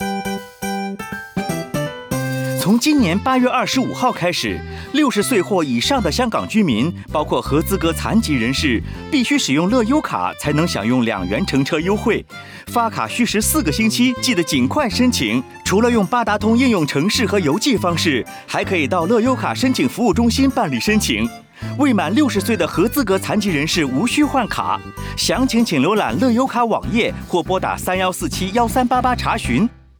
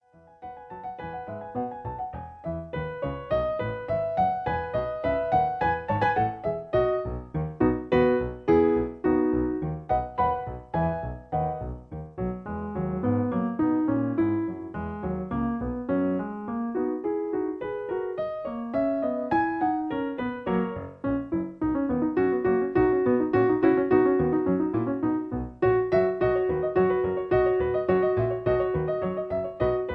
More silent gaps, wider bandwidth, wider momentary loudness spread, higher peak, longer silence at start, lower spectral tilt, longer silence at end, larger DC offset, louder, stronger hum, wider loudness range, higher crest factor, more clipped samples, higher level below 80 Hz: neither; first, over 20 kHz vs 5.2 kHz; second, 7 LU vs 11 LU; first, -6 dBFS vs -10 dBFS; second, 0 s vs 0.4 s; second, -4.5 dB/octave vs -10 dB/octave; first, 0.25 s vs 0 s; neither; first, -18 LUFS vs -27 LUFS; neither; second, 2 LU vs 6 LU; about the same, 12 dB vs 16 dB; neither; first, -38 dBFS vs -46 dBFS